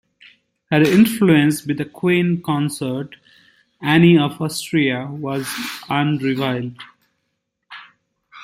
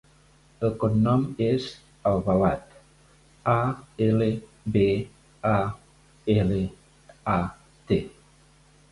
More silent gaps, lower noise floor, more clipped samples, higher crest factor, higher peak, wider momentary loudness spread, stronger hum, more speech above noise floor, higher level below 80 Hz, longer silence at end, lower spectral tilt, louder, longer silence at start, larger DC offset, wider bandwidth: neither; first, -74 dBFS vs -57 dBFS; neither; about the same, 18 dB vs 18 dB; first, -2 dBFS vs -8 dBFS; about the same, 13 LU vs 11 LU; neither; first, 57 dB vs 34 dB; second, -58 dBFS vs -48 dBFS; second, 0 s vs 0.85 s; second, -6 dB/octave vs -8.5 dB/octave; first, -18 LUFS vs -26 LUFS; about the same, 0.7 s vs 0.6 s; neither; first, 16 kHz vs 11.5 kHz